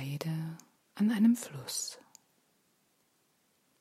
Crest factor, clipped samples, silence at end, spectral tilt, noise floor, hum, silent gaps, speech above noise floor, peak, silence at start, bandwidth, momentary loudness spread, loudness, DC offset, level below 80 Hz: 18 dB; under 0.1%; 1.85 s; -5 dB/octave; -73 dBFS; none; none; 43 dB; -16 dBFS; 0 s; 15.5 kHz; 18 LU; -32 LUFS; under 0.1%; -82 dBFS